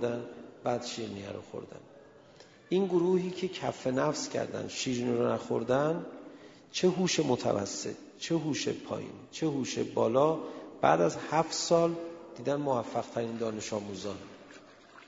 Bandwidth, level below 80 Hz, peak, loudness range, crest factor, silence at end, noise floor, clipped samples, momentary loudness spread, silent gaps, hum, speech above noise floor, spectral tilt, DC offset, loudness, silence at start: 7.8 kHz; -70 dBFS; -10 dBFS; 4 LU; 22 dB; 0.05 s; -56 dBFS; under 0.1%; 16 LU; none; none; 25 dB; -5 dB/octave; under 0.1%; -31 LUFS; 0 s